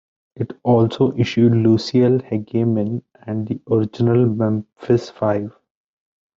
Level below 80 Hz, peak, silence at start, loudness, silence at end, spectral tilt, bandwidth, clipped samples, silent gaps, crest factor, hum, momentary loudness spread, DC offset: -56 dBFS; -2 dBFS; 0.4 s; -19 LUFS; 0.9 s; -8.5 dB/octave; 7.4 kHz; under 0.1%; none; 16 dB; none; 11 LU; under 0.1%